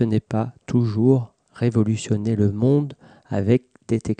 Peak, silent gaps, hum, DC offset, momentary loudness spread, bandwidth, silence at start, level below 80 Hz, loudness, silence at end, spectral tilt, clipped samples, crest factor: -6 dBFS; none; none; under 0.1%; 8 LU; 9.2 kHz; 0 s; -54 dBFS; -22 LUFS; 0.05 s; -8 dB/octave; under 0.1%; 16 dB